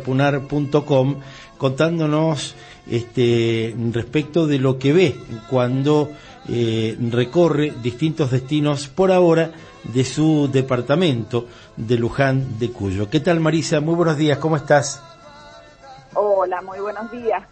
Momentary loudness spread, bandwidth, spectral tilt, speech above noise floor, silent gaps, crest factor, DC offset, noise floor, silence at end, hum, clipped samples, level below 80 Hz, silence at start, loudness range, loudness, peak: 10 LU; 8.8 kHz; -6.5 dB/octave; 24 dB; none; 16 dB; under 0.1%; -43 dBFS; 0.05 s; none; under 0.1%; -50 dBFS; 0 s; 2 LU; -19 LUFS; -2 dBFS